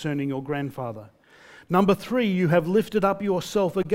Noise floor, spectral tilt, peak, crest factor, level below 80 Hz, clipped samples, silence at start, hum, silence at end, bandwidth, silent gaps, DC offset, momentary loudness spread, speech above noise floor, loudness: -51 dBFS; -7 dB/octave; -6 dBFS; 18 dB; -58 dBFS; under 0.1%; 0 s; none; 0 s; 16 kHz; none; under 0.1%; 11 LU; 27 dB; -24 LUFS